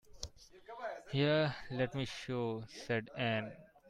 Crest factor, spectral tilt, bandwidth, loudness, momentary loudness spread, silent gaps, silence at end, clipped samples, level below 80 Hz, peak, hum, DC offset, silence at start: 18 dB; -6 dB/octave; 12 kHz; -37 LUFS; 17 LU; none; 0 s; under 0.1%; -64 dBFS; -20 dBFS; none; under 0.1%; 0.1 s